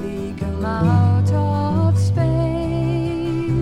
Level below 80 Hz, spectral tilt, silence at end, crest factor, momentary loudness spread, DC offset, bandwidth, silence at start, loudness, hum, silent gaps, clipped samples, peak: -34 dBFS; -8.5 dB/octave; 0 s; 12 dB; 8 LU; under 0.1%; 10 kHz; 0 s; -19 LUFS; none; none; under 0.1%; -6 dBFS